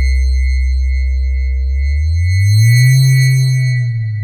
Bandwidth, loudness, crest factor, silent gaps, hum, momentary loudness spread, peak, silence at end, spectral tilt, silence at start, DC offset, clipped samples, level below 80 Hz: 15.5 kHz; -13 LUFS; 8 dB; none; none; 8 LU; -2 dBFS; 0 s; -5 dB/octave; 0 s; under 0.1%; under 0.1%; -16 dBFS